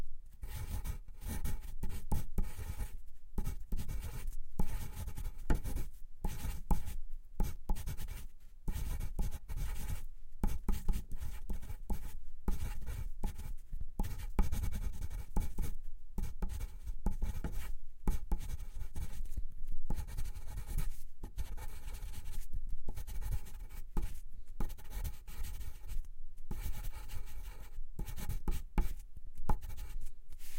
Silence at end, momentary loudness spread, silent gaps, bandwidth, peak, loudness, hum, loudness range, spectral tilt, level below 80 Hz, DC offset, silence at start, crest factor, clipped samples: 0 s; 10 LU; none; 16.5 kHz; -16 dBFS; -45 LUFS; none; 4 LU; -5.5 dB/octave; -38 dBFS; under 0.1%; 0 s; 18 dB; under 0.1%